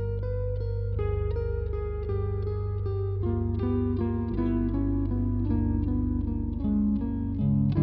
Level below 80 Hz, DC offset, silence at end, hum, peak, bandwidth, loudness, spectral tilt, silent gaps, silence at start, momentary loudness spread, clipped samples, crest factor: -34 dBFS; under 0.1%; 0 s; 50 Hz at -45 dBFS; -14 dBFS; 4.6 kHz; -29 LUFS; -11 dB/octave; none; 0 s; 4 LU; under 0.1%; 14 dB